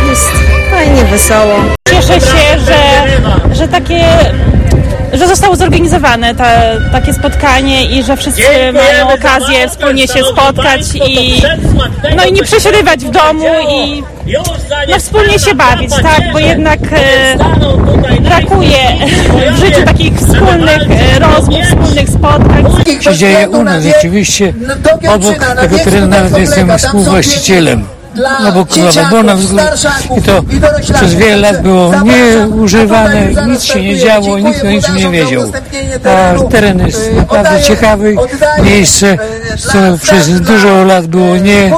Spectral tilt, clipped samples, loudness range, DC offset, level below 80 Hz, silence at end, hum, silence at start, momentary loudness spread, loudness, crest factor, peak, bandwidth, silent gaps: -4.5 dB/octave; 4%; 2 LU; under 0.1%; -16 dBFS; 0 s; none; 0 s; 5 LU; -7 LUFS; 6 dB; 0 dBFS; 18.5 kHz; none